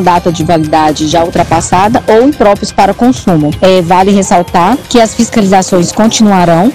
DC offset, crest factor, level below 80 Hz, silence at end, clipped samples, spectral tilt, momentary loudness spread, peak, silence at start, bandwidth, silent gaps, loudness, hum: 2%; 8 dB; -32 dBFS; 0 s; 7%; -5 dB/octave; 4 LU; 0 dBFS; 0 s; 15.5 kHz; none; -8 LUFS; none